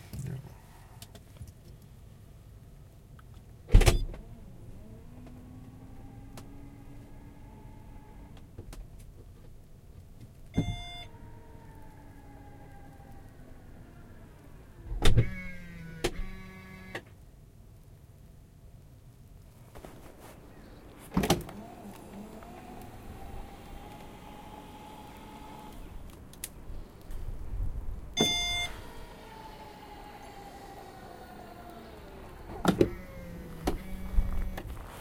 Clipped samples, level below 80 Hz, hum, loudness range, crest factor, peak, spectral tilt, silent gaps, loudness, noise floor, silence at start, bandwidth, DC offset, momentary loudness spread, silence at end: under 0.1%; -38 dBFS; none; 18 LU; 30 dB; -6 dBFS; -4.5 dB/octave; none; -35 LUFS; -53 dBFS; 0 s; 16.5 kHz; under 0.1%; 24 LU; 0 s